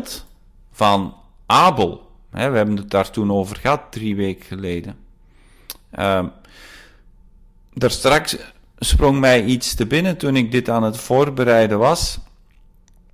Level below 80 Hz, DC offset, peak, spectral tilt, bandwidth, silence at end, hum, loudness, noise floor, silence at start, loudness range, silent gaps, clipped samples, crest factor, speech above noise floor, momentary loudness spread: -32 dBFS; under 0.1%; -4 dBFS; -5 dB/octave; 16 kHz; 0.9 s; none; -18 LUFS; -49 dBFS; 0 s; 9 LU; none; under 0.1%; 16 dB; 32 dB; 17 LU